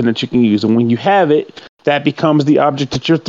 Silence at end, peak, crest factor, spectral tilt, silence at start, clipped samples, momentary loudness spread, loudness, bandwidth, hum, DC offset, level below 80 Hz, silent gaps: 0 s; 0 dBFS; 12 dB; -6.5 dB/octave; 0 s; under 0.1%; 6 LU; -13 LUFS; 7.6 kHz; none; under 0.1%; -52 dBFS; 1.69-1.77 s